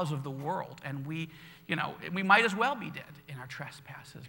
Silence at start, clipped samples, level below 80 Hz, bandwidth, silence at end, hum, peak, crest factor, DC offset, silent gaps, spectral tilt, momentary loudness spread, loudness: 0 s; under 0.1%; -72 dBFS; 17 kHz; 0 s; none; -8 dBFS; 26 dB; under 0.1%; none; -5 dB/octave; 22 LU; -31 LUFS